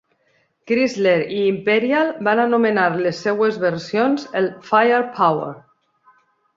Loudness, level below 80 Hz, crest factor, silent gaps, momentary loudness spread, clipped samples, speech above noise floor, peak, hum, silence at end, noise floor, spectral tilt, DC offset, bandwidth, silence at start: -18 LUFS; -66 dBFS; 16 dB; none; 6 LU; under 0.1%; 45 dB; -2 dBFS; none; 1 s; -63 dBFS; -6 dB/octave; under 0.1%; 7.6 kHz; 0.65 s